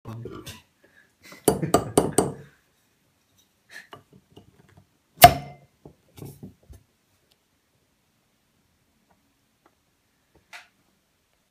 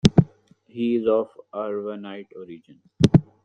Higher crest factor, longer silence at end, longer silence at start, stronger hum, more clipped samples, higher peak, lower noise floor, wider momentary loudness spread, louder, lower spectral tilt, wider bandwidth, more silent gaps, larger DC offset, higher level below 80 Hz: first, 28 dB vs 22 dB; first, 0.95 s vs 0.2 s; about the same, 0.05 s vs 0.05 s; neither; neither; about the same, 0 dBFS vs 0 dBFS; first, -69 dBFS vs -49 dBFS; first, 32 LU vs 22 LU; first, -20 LUFS vs -23 LUFS; second, -3.5 dB/octave vs -7.5 dB/octave; first, 15.5 kHz vs 9.8 kHz; neither; neither; about the same, -50 dBFS vs -46 dBFS